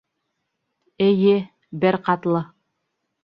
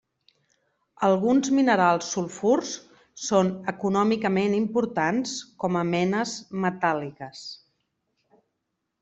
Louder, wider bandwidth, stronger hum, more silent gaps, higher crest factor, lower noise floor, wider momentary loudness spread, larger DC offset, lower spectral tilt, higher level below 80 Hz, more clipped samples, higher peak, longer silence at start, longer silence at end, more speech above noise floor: first, -20 LUFS vs -24 LUFS; second, 5.4 kHz vs 8.2 kHz; neither; neither; about the same, 18 dB vs 18 dB; second, -76 dBFS vs -80 dBFS; second, 11 LU vs 15 LU; neither; first, -10 dB/octave vs -5 dB/octave; about the same, -66 dBFS vs -66 dBFS; neither; about the same, -4 dBFS vs -6 dBFS; about the same, 1 s vs 1 s; second, 0.8 s vs 1.45 s; about the same, 58 dB vs 56 dB